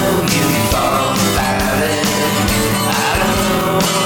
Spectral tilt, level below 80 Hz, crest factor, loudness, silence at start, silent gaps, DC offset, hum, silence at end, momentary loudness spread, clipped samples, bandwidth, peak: -4 dB/octave; -30 dBFS; 14 dB; -14 LUFS; 0 s; none; under 0.1%; none; 0 s; 1 LU; under 0.1%; 19.5 kHz; -2 dBFS